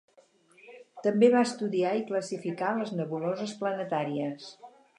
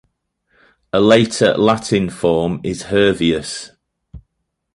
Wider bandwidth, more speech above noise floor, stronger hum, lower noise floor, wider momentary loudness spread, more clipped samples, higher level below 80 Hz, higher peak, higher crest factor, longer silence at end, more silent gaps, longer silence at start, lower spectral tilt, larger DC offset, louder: about the same, 11 kHz vs 11.5 kHz; second, 34 dB vs 58 dB; neither; second, -62 dBFS vs -73 dBFS; about the same, 13 LU vs 11 LU; neither; second, -84 dBFS vs -44 dBFS; second, -10 dBFS vs 0 dBFS; about the same, 20 dB vs 16 dB; second, 0.3 s vs 0.55 s; neither; second, 0.65 s vs 0.95 s; about the same, -6 dB/octave vs -5 dB/octave; neither; second, -29 LUFS vs -16 LUFS